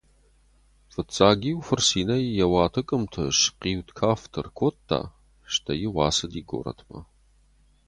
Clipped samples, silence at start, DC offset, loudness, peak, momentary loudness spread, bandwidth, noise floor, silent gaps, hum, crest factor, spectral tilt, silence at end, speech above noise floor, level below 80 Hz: under 0.1%; 1 s; under 0.1%; -24 LUFS; -2 dBFS; 14 LU; 11.5 kHz; -60 dBFS; none; 50 Hz at -50 dBFS; 24 dB; -4 dB/octave; 0.85 s; 35 dB; -46 dBFS